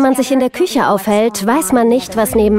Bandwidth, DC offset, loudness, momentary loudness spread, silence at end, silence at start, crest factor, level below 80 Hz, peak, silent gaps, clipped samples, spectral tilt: 16 kHz; 0.2%; -13 LUFS; 3 LU; 0 s; 0 s; 12 dB; -38 dBFS; 0 dBFS; none; under 0.1%; -4.5 dB/octave